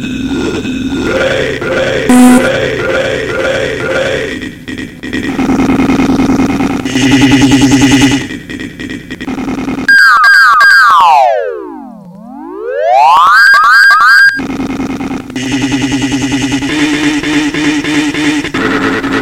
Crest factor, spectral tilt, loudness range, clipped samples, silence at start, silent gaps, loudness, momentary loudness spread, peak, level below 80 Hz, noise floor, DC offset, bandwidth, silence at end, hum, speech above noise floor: 8 dB; -4 dB/octave; 6 LU; 2%; 0 s; none; -8 LUFS; 17 LU; 0 dBFS; -34 dBFS; -29 dBFS; under 0.1%; 16.5 kHz; 0 s; none; 20 dB